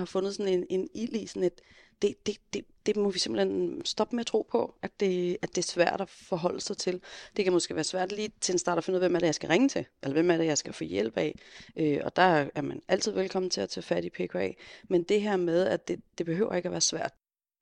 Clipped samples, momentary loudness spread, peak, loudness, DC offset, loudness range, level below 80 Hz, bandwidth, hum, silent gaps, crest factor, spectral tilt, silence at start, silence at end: under 0.1%; 9 LU; -10 dBFS; -29 LUFS; under 0.1%; 3 LU; -66 dBFS; 10.5 kHz; none; none; 20 dB; -4 dB/octave; 0 s; 0.5 s